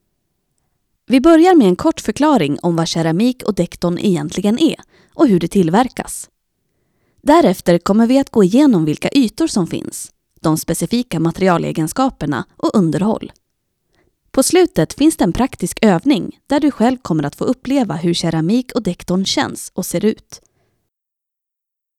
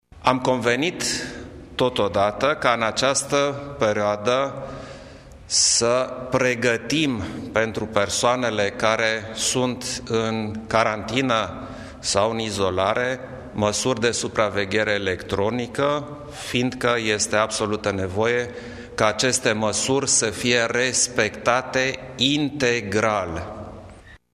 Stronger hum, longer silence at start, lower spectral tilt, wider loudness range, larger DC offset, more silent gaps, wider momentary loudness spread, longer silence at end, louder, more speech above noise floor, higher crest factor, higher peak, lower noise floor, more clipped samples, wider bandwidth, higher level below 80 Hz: neither; first, 1.1 s vs 0.15 s; first, -5.5 dB/octave vs -3 dB/octave; about the same, 4 LU vs 3 LU; neither; neither; about the same, 10 LU vs 10 LU; first, 1.6 s vs 0.15 s; first, -15 LUFS vs -22 LUFS; first, 67 dB vs 23 dB; about the same, 16 dB vs 20 dB; about the same, 0 dBFS vs -2 dBFS; first, -82 dBFS vs -45 dBFS; neither; about the same, 15.5 kHz vs 14.5 kHz; first, -44 dBFS vs -50 dBFS